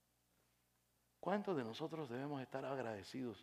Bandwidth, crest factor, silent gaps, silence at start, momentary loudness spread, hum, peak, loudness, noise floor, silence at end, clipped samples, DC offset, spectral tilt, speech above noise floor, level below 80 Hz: 15 kHz; 22 dB; none; 1.25 s; 6 LU; 60 Hz at -70 dBFS; -24 dBFS; -45 LUFS; -81 dBFS; 0 s; under 0.1%; under 0.1%; -6.5 dB/octave; 36 dB; -86 dBFS